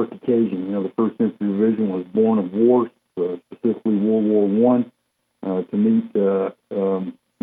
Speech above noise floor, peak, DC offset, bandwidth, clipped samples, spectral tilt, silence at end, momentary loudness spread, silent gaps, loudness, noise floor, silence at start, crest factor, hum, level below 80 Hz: 53 dB; -6 dBFS; under 0.1%; 3.9 kHz; under 0.1%; -11.5 dB/octave; 0.3 s; 9 LU; none; -20 LUFS; -72 dBFS; 0 s; 14 dB; none; -72 dBFS